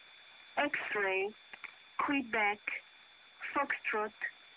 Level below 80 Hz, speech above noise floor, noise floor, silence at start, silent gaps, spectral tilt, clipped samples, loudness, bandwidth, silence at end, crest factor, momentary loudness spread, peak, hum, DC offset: -76 dBFS; 24 dB; -59 dBFS; 0 s; none; -0.5 dB/octave; under 0.1%; -35 LUFS; 4 kHz; 0 s; 16 dB; 17 LU; -22 dBFS; none; under 0.1%